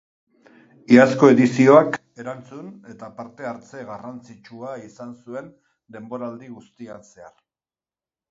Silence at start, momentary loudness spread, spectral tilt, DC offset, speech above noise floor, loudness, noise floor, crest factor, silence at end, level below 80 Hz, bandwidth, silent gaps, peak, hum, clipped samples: 0.9 s; 26 LU; -7 dB/octave; under 0.1%; over 70 dB; -15 LUFS; under -90 dBFS; 22 dB; 1.35 s; -68 dBFS; 7.8 kHz; none; 0 dBFS; none; under 0.1%